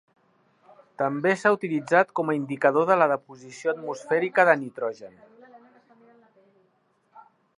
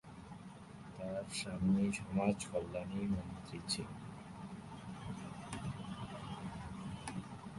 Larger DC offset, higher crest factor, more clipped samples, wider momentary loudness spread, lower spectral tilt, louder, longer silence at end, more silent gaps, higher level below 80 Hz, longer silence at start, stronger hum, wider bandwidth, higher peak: neither; about the same, 22 dB vs 22 dB; neither; second, 12 LU vs 15 LU; about the same, -6 dB/octave vs -5.5 dB/octave; first, -24 LUFS vs -41 LUFS; first, 0.4 s vs 0 s; neither; second, -80 dBFS vs -60 dBFS; first, 1 s vs 0.05 s; neither; about the same, 11 kHz vs 11.5 kHz; first, -4 dBFS vs -20 dBFS